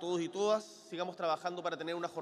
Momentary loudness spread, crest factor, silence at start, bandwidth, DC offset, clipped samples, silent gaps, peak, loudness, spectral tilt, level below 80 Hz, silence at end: 8 LU; 18 dB; 0 s; 13 kHz; under 0.1%; under 0.1%; none; -20 dBFS; -36 LUFS; -4.5 dB/octave; -84 dBFS; 0 s